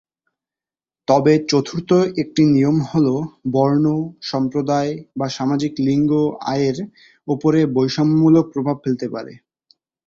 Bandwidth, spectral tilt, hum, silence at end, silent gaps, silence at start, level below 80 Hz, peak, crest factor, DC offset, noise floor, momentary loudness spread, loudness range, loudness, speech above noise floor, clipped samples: 7.6 kHz; -7 dB/octave; none; 0.7 s; none; 1.1 s; -56 dBFS; -2 dBFS; 16 dB; under 0.1%; under -90 dBFS; 11 LU; 3 LU; -18 LUFS; over 73 dB; under 0.1%